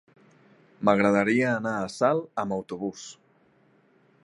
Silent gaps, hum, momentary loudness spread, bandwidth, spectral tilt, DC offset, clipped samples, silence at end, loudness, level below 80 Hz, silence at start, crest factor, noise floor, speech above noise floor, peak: none; none; 13 LU; 11.5 kHz; -6 dB/octave; under 0.1%; under 0.1%; 1.1 s; -25 LUFS; -66 dBFS; 0.8 s; 22 dB; -62 dBFS; 37 dB; -6 dBFS